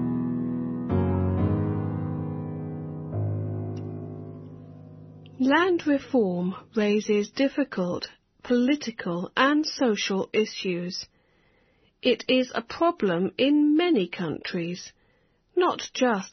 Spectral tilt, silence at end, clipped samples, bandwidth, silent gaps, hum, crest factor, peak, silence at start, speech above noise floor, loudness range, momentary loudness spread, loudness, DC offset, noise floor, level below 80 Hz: -5 dB/octave; 0.05 s; under 0.1%; 6.4 kHz; none; none; 18 dB; -8 dBFS; 0 s; 41 dB; 5 LU; 16 LU; -26 LUFS; under 0.1%; -66 dBFS; -56 dBFS